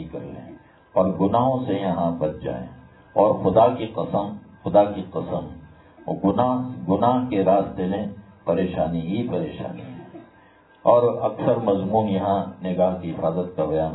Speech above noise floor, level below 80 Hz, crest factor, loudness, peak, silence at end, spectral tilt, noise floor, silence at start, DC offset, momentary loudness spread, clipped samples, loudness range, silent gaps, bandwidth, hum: 31 dB; -52 dBFS; 20 dB; -22 LUFS; -2 dBFS; 0 s; -12 dB/octave; -53 dBFS; 0 s; under 0.1%; 15 LU; under 0.1%; 3 LU; none; 4.1 kHz; none